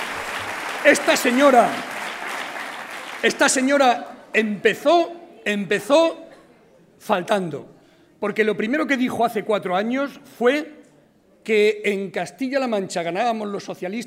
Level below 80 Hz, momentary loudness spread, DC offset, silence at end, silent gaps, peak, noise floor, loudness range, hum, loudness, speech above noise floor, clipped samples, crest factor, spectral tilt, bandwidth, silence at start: -68 dBFS; 13 LU; under 0.1%; 0 s; none; 0 dBFS; -55 dBFS; 4 LU; none; -21 LUFS; 36 dB; under 0.1%; 22 dB; -3.5 dB/octave; 16 kHz; 0 s